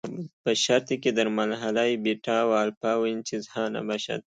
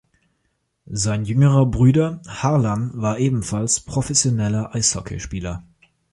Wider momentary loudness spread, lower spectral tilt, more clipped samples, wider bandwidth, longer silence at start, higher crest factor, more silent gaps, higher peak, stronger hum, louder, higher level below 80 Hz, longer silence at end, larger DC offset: second, 8 LU vs 13 LU; about the same, -4 dB/octave vs -5 dB/octave; neither; second, 9.4 kHz vs 11.5 kHz; second, 0.05 s vs 0.9 s; about the same, 18 dB vs 18 dB; first, 0.33-0.44 s, 2.77-2.81 s vs none; second, -8 dBFS vs -2 dBFS; neither; second, -26 LUFS vs -20 LUFS; second, -72 dBFS vs -42 dBFS; second, 0.15 s vs 0.5 s; neither